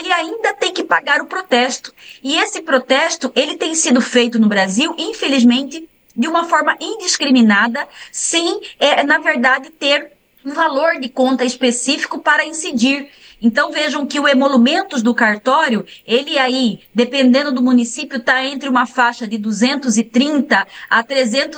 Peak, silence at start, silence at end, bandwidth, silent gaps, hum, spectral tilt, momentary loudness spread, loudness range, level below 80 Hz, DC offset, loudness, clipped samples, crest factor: -2 dBFS; 0 s; 0 s; 10 kHz; none; none; -2.5 dB/octave; 7 LU; 2 LU; -64 dBFS; under 0.1%; -15 LUFS; under 0.1%; 14 dB